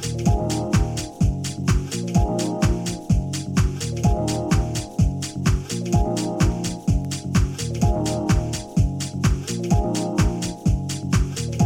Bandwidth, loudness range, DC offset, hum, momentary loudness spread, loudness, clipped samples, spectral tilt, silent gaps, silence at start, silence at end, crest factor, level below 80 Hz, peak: 16.5 kHz; 1 LU; under 0.1%; none; 3 LU; -23 LUFS; under 0.1%; -6 dB/octave; none; 0 s; 0 s; 16 dB; -28 dBFS; -6 dBFS